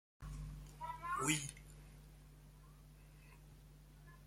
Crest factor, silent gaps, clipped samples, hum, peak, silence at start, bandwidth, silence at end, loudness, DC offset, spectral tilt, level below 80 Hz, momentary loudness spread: 28 dB; none; under 0.1%; none; -20 dBFS; 0.2 s; 16.5 kHz; 0 s; -43 LUFS; under 0.1%; -3 dB/octave; -58 dBFS; 24 LU